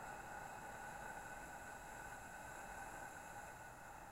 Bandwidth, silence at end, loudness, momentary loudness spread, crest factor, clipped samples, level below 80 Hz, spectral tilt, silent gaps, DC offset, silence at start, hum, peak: 16 kHz; 0 s; -52 LUFS; 3 LU; 14 dB; under 0.1%; -66 dBFS; -3 dB/octave; none; under 0.1%; 0 s; none; -40 dBFS